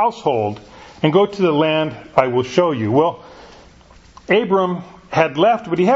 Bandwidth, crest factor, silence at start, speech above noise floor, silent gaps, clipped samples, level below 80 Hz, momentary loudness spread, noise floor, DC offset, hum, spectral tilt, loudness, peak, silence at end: 7.8 kHz; 18 dB; 0 s; 29 dB; none; under 0.1%; -52 dBFS; 7 LU; -46 dBFS; under 0.1%; none; -6.5 dB/octave; -17 LUFS; 0 dBFS; 0 s